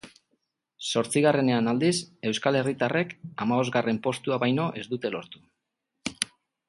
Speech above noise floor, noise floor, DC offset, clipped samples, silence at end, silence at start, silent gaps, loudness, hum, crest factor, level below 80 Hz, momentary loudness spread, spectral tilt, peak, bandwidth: 56 dB; -82 dBFS; under 0.1%; under 0.1%; 0.45 s; 0.05 s; none; -26 LUFS; none; 22 dB; -68 dBFS; 11 LU; -5 dB/octave; -6 dBFS; 11.5 kHz